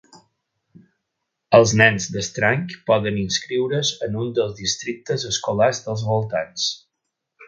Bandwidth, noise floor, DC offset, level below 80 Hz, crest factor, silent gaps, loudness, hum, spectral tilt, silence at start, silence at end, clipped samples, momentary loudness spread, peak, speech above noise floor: 9.4 kHz; -79 dBFS; under 0.1%; -54 dBFS; 22 dB; none; -20 LUFS; none; -4 dB/octave; 1.5 s; 0 s; under 0.1%; 11 LU; 0 dBFS; 59 dB